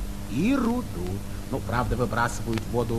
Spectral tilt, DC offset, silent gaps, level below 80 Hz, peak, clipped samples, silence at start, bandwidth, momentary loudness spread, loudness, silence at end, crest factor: -6 dB/octave; 1%; none; -36 dBFS; -10 dBFS; under 0.1%; 0 s; 14.5 kHz; 9 LU; -27 LUFS; 0 s; 18 dB